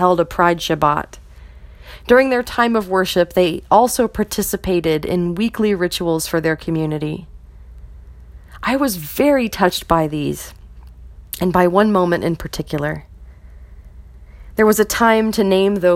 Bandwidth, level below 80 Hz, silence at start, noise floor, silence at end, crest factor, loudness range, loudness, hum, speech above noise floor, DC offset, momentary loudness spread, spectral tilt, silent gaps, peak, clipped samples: 17 kHz; -40 dBFS; 0 s; -39 dBFS; 0 s; 18 dB; 4 LU; -17 LUFS; none; 23 dB; under 0.1%; 11 LU; -5 dB/octave; none; 0 dBFS; under 0.1%